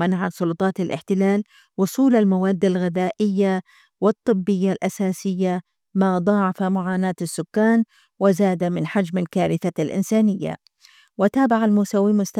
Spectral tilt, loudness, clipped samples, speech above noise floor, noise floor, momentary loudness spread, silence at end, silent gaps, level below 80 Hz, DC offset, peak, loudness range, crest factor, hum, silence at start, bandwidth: -7 dB/octave; -21 LUFS; under 0.1%; 34 dB; -54 dBFS; 7 LU; 0 s; none; -66 dBFS; under 0.1%; -4 dBFS; 2 LU; 16 dB; none; 0 s; 14.5 kHz